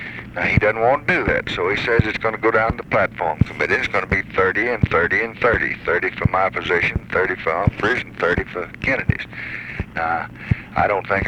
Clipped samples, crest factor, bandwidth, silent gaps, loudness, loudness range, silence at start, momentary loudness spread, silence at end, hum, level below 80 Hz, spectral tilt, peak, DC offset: under 0.1%; 20 dB; 10.5 kHz; none; -19 LUFS; 3 LU; 0 s; 7 LU; 0 s; none; -36 dBFS; -7 dB/octave; 0 dBFS; under 0.1%